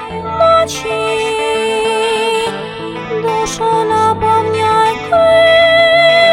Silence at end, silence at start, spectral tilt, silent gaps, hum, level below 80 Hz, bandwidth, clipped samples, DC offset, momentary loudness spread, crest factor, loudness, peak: 0 s; 0 s; -3.5 dB/octave; none; none; -42 dBFS; 16 kHz; under 0.1%; under 0.1%; 11 LU; 12 dB; -12 LUFS; 0 dBFS